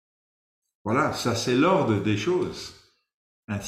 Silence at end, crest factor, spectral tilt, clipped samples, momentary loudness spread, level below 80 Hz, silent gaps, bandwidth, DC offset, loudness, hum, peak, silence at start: 0 s; 18 dB; -5.5 dB/octave; under 0.1%; 16 LU; -60 dBFS; 3.14-3.48 s; 15.5 kHz; under 0.1%; -24 LUFS; none; -8 dBFS; 0.85 s